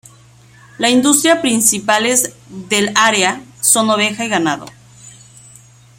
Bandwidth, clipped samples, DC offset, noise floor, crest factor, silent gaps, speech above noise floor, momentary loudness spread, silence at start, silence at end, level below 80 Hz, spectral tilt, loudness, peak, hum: 16.5 kHz; under 0.1%; under 0.1%; -44 dBFS; 16 dB; none; 30 dB; 7 LU; 0.8 s; 0.9 s; -58 dBFS; -2 dB/octave; -13 LUFS; 0 dBFS; none